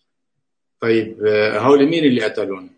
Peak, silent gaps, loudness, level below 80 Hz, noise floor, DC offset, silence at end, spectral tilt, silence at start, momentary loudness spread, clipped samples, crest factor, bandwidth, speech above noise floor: -2 dBFS; none; -16 LUFS; -64 dBFS; -79 dBFS; under 0.1%; 0.1 s; -6.5 dB/octave; 0.8 s; 9 LU; under 0.1%; 16 dB; 9.4 kHz; 63 dB